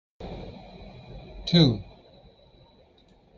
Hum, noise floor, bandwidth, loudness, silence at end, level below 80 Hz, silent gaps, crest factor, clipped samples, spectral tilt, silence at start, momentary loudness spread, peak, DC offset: none; -58 dBFS; 6.8 kHz; -23 LUFS; 1.55 s; -48 dBFS; none; 22 dB; under 0.1%; -7 dB/octave; 0.2 s; 26 LU; -6 dBFS; under 0.1%